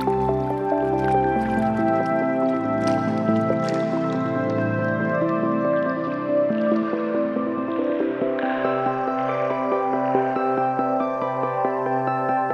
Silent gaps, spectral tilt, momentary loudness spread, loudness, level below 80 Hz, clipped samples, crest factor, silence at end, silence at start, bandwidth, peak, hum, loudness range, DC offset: none; -8 dB/octave; 3 LU; -22 LUFS; -50 dBFS; under 0.1%; 16 dB; 0 s; 0 s; 10 kHz; -6 dBFS; none; 2 LU; under 0.1%